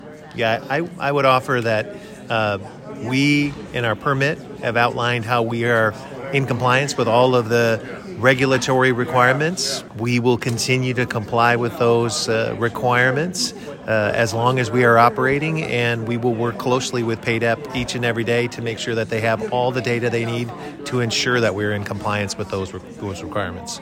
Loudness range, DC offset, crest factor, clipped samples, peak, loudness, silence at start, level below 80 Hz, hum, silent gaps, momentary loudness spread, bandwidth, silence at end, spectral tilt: 4 LU; under 0.1%; 18 dB; under 0.1%; 0 dBFS; -19 LUFS; 0 s; -52 dBFS; none; none; 9 LU; 16.5 kHz; 0 s; -5 dB/octave